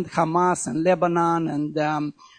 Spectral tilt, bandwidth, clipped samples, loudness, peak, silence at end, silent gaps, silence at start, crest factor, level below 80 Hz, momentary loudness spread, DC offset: -6 dB/octave; 9.6 kHz; under 0.1%; -22 LUFS; -6 dBFS; 0.25 s; none; 0 s; 16 dB; -62 dBFS; 5 LU; under 0.1%